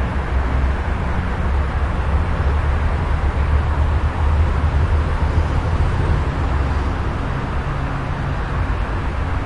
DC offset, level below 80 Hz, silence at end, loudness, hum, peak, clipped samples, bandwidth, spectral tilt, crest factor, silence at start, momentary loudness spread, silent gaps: under 0.1%; -20 dBFS; 0 s; -20 LUFS; none; -6 dBFS; under 0.1%; 8 kHz; -7.5 dB/octave; 12 dB; 0 s; 4 LU; none